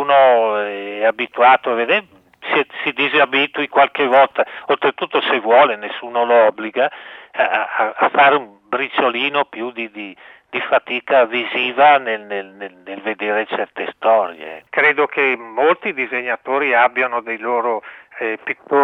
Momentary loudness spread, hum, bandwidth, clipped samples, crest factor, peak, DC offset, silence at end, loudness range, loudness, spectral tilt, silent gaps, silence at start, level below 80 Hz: 13 LU; none; 5.6 kHz; under 0.1%; 16 dB; 0 dBFS; under 0.1%; 0 s; 3 LU; -17 LUFS; -6 dB/octave; none; 0 s; -74 dBFS